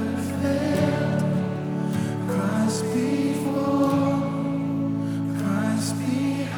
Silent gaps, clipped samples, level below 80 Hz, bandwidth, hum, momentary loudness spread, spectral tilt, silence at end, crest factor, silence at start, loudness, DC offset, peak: none; under 0.1%; -60 dBFS; 19.5 kHz; none; 4 LU; -6.5 dB/octave; 0 s; 16 dB; 0 s; -24 LUFS; under 0.1%; -8 dBFS